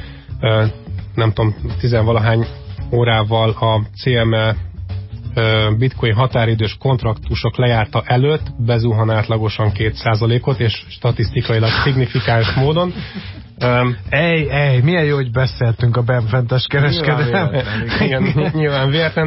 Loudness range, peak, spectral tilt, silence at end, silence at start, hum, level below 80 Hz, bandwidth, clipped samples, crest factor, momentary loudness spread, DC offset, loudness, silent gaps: 2 LU; -2 dBFS; -11 dB/octave; 0 s; 0 s; none; -32 dBFS; 5.8 kHz; under 0.1%; 12 dB; 6 LU; under 0.1%; -16 LUFS; none